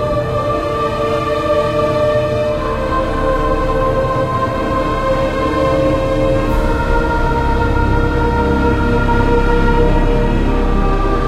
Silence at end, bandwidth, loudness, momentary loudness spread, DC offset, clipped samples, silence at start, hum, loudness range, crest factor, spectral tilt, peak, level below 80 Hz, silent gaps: 0 s; 11 kHz; -15 LUFS; 3 LU; under 0.1%; under 0.1%; 0 s; none; 1 LU; 14 dB; -7.5 dB/octave; 0 dBFS; -20 dBFS; none